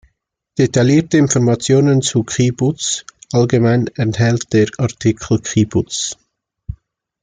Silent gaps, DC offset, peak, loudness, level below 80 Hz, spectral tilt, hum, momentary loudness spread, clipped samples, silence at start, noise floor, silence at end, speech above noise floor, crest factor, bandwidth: none; under 0.1%; -2 dBFS; -15 LUFS; -44 dBFS; -5.5 dB/octave; none; 11 LU; under 0.1%; 0.6 s; -66 dBFS; 0.5 s; 51 dB; 14 dB; 9.6 kHz